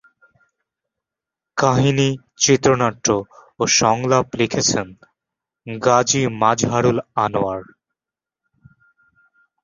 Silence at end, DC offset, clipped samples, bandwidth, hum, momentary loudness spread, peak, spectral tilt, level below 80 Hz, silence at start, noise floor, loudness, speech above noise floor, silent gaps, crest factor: 2 s; under 0.1%; under 0.1%; 7.6 kHz; none; 9 LU; -2 dBFS; -4 dB/octave; -52 dBFS; 1.55 s; -89 dBFS; -18 LUFS; 71 dB; none; 18 dB